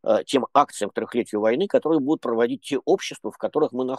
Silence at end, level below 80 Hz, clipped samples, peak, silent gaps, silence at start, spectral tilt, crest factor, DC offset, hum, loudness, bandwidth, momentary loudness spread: 0 s; -74 dBFS; under 0.1%; -2 dBFS; none; 0.05 s; -5 dB/octave; 20 dB; under 0.1%; none; -23 LUFS; 12.5 kHz; 6 LU